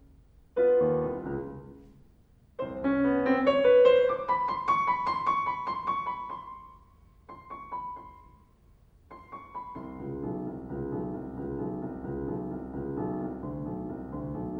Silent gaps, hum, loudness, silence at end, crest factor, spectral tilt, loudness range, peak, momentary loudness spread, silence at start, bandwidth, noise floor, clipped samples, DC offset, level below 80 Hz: none; none; -29 LUFS; 0 s; 20 dB; -8 dB/octave; 17 LU; -10 dBFS; 18 LU; 0.55 s; 6.2 kHz; -59 dBFS; under 0.1%; under 0.1%; -54 dBFS